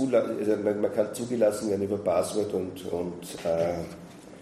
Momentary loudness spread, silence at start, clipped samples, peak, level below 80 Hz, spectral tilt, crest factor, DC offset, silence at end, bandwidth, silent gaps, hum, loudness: 10 LU; 0 s; under 0.1%; -12 dBFS; -60 dBFS; -6 dB/octave; 16 dB; under 0.1%; 0 s; 15 kHz; none; none; -28 LUFS